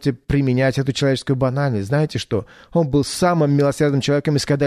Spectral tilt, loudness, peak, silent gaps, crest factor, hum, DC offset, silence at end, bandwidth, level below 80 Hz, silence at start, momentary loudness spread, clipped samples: -6.5 dB/octave; -19 LUFS; -4 dBFS; none; 14 dB; none; under 0.1%; 0 s; 13.5 kHz; -42 dBFS; 0 s; 5 LU; under 0.1%